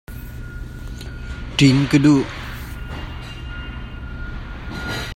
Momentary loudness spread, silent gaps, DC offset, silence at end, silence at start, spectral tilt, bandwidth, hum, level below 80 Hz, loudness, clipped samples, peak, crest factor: 20 LU; none; under 0.1%; 0 s; 0.1 s; -6 dB/octave; 16.5 kHz; none; -34 dBFS; -19 LUFS; under 0.1%; 0 dBFS; 20 dB